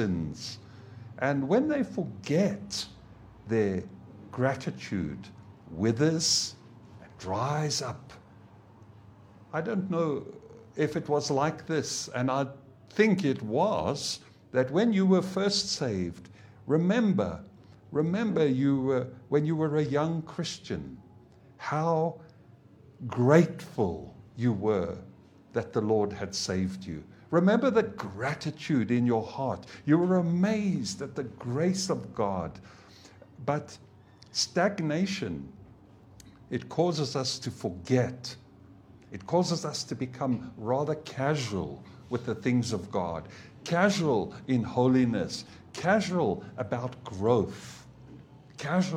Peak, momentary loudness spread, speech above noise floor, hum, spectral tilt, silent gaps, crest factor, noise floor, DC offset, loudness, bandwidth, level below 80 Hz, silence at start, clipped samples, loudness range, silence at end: -6 dBFS; 16 LU; 27 dB; none; -5.5 dB/octave; none; 22 dB; -55 dBFS; under 0.1%; -29 LUFS; 14.5 kHz; -62 dBFS; 0 s; under 0.1%; 5 LU; 0 s